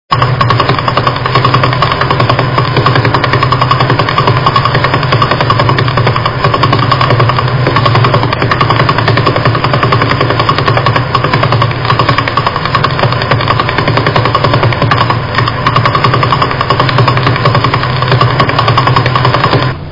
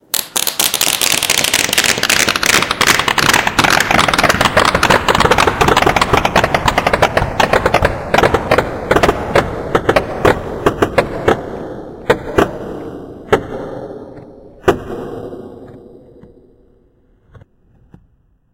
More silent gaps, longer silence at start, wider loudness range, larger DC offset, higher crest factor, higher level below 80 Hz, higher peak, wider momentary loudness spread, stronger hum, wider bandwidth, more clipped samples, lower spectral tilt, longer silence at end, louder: neither; about the same, 0.1 s vs 0.15 s; second, 1 LU vs 13 LU; first, 2% vs under 0.1%; second, 8 dB vs 14 dB; about the same, -32 dBFS vs -32 dBFS; about the same, 0 dBFS vs 0 dBFS; second, 2 LU vs 15 LU; neither; second, 6 kHz vs over 20 kHz; first, 1% vs 0.3%; first, -7 dB/octave vs -3 dB/octave; second, 0 s vs 2.6 s; first, -9 LUFS vs -13 LUFS